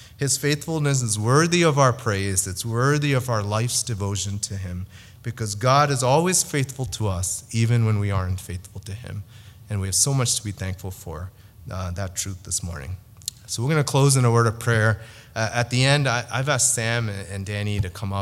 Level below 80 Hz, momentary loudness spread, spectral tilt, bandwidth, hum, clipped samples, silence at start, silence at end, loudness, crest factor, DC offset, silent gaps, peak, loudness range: -48 dBFS; 16 LU; -4 dB/octave; 15.5 kHz; none; under 0.1%; 0 s; 0 s; -22 LUFS; 22 dB; under 0.1%; none; 0 dBFS; 5 LU